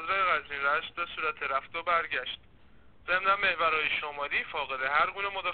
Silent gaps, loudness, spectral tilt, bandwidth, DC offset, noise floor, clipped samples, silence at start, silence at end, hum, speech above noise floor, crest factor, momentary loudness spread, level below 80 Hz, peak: none; -29 LUFS; 1.5 dB/octave; 4.6 kHz; 0.2%; -59 dBFS; under 0.1%; 0 s; 0 s; none; 29 dB; 18 dB; 8 LU; -60 dBFS; -12 dBFS